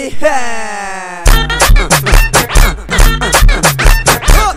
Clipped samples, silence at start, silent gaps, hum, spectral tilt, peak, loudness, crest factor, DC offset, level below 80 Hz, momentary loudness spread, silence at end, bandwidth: 0.3%; 0 s; none; none; -3 dB/octave; 0 dBFS; -10 LUFS; 8 dB; under 0.1%; -10 dBFS; 9 LU; 0 s; 16 kHz